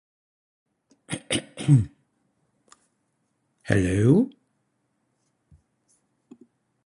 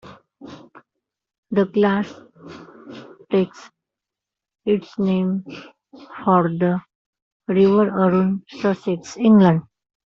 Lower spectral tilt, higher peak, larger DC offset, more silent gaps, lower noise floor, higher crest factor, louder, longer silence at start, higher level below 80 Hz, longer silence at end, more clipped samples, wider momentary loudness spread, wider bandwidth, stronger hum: about the same, -6.5 dB/octave vs -7 dB/octave; about the same, -4 dBFS vs -4 dBFS; neither; second, none vs 1.38-1.43 s, 6.95-7.13 s, 7.22-7.40 s; second, -73 dBFS vs -87 dBFS; first, 24 dB vs 18 dB; second, -23 LUFS vs -19 LUFS; first, 1.1 s vs 0.05 s; first, -50 dBFS vs -62 dBFS; first, 2.6 s vs 0.5 s; neither; second, 16 LU vs 24 LU; first, 11.5 kHz vs 7.4 kHz; neither